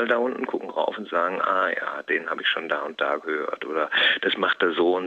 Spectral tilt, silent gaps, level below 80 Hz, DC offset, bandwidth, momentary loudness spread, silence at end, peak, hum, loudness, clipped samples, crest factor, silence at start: -4.5 dB/octave; none; -82 dBFS; under 0.1%; 7.8 kHz; 8 LU; 0 s; -8 dBFS; none; -24 LUFS; under 0.1%; 18 dB; 0 s